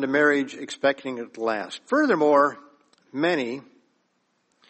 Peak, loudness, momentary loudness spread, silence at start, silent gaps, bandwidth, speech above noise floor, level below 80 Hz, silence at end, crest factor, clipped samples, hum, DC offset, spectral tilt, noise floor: -6 dBFS; -23 LUFS; 13 LU; 0 s; none; 8.4 kHz; 47 dB; -74 dBFS; 1.1 s; 18 dB; under 0.1%; none; under 0.1%; -5 dB/octave; -71 dBFS